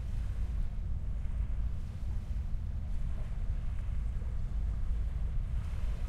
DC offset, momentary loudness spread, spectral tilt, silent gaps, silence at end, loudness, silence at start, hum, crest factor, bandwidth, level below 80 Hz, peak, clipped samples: under 0.1%; 2 LU; -8 dB/octave; none; 0 s; -39 LUFS; 0 s; none; 12 dB; 6.4 kHz; -34 dBFS; -22 dBFS; under 0.1%